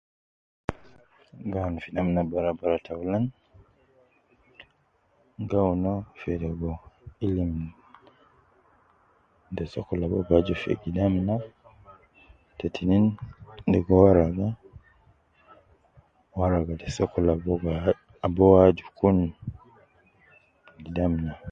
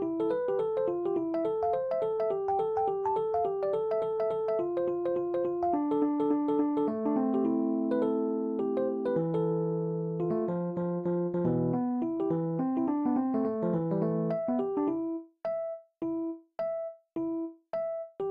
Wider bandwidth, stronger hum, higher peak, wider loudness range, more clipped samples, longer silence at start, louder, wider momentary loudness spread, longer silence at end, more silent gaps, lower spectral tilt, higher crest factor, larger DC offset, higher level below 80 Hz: first, 7.6 kHz vs 5 kHz; neither; first, -4 dBFS vs -16 dBFS; first, 9 LU vs 4 LU; neither; first, 0.7 s vs 0 s; first, -25 LUFS vs -31 LUFS; first, 18 LU vs 7 LU; about the same, 0 s vs 0 s; neither; second, -9 dB/octave vs -11 dB/octave; first, 24 dB vs 14 dB; neither; first, -42 dBFS vs -70 dBFS